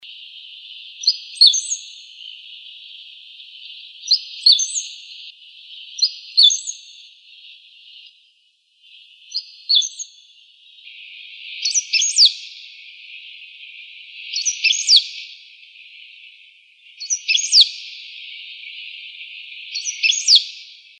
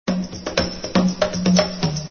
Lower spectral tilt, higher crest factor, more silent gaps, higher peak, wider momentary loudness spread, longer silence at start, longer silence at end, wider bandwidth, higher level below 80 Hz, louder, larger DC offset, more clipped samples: second, 13.5 dB/octave vs -5 dB/octave; about the same, 22 dB vs 18 dB; neither; about the same, 0 dBFS vs -2 dBFS; first, 25 LU vs 7 LU; about the same, 0.05 s vs 0.05 s; first, 0.35 s vs 0 s; first, 10.5 kHz vs 6.8 kHz; second, under -90 dBFS vs -42 dBFS; first, -15 LUFS vs -21 LUFS; neither; neither